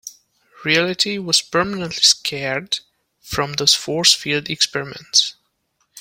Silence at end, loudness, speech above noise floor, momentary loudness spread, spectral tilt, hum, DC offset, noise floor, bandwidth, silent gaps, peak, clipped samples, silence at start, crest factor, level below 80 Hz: 0 s; -17 LUFS; 49 dB; 11 LU; -1.5 dB/octave; none; under 0.1%; -68 dBFS; 16.5 kHz; none; 0 dBFS; under 0.1%; 0.05 s; 20 dB; -54 dBFS